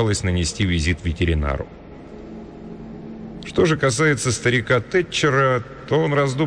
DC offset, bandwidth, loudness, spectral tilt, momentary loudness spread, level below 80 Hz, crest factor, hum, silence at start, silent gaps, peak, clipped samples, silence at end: under 0.1%; 10 kHz; -20 LUFS; -5 dB/octave; 19 LU; -34 dBFS; 12 dB; none; 0 s; none; -8 dBFS; under 0.1%; 0 s